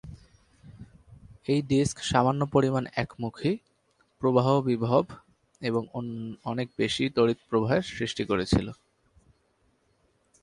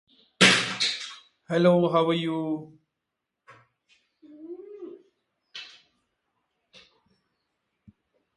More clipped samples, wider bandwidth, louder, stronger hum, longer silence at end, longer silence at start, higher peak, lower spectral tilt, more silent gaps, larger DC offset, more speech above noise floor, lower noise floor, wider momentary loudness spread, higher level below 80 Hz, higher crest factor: neither; about the same, 11.5 kHz vs 11.5 kHz; second, -27 LUFS vs -23 LUFS; neither; second, 1.7 s vs 2.7 s; second, 0.05 s vs 0.4 s; second, -8 dBFS vs -4 dBFS; first, -6 dB/octave vs -4 dB/octave; neither; neither; second, 43 dB vs 61 dB; second, -69 dBFS vs -84 dBFS; second, 11 LU vs 25 LU; first, -50 dBFS vs -72 dBFS; second, 20 dB vs 26 dB